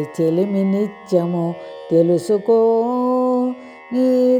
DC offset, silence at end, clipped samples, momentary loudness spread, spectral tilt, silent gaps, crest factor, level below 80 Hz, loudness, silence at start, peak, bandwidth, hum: under 0.1%; 0 s; under 0.1%; 9 LU; -8.5 dB/octave; none; 14 dB; -70 dBFS; -18 LUFS; 0 s; -4 dBFS; 12.5 kHz; none